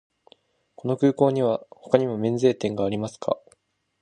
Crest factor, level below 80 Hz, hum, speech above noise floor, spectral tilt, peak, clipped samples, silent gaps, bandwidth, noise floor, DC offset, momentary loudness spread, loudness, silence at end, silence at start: 22 dB; -62 dBFS; none; 42 dB; -7.5 dB/octave; -2 dBFS; under 0.1%; none; 9.8 kHz; -64 dBFS; under 0.1%; 9 LU; -24 LUFS; 0.65 s; 0.85 s